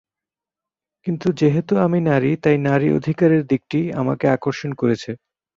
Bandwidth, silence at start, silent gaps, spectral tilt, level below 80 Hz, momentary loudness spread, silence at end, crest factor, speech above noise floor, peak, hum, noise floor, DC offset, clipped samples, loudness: 7.6 kHz; 1.05 s; none; -8 dB/octave; -56 dBFS; 8 LU; 0.4 s; 16 dB; 70 dB; -2 dBFS; none; -89 dBFS; under 0.1%; under 0.1%; -19 LUFS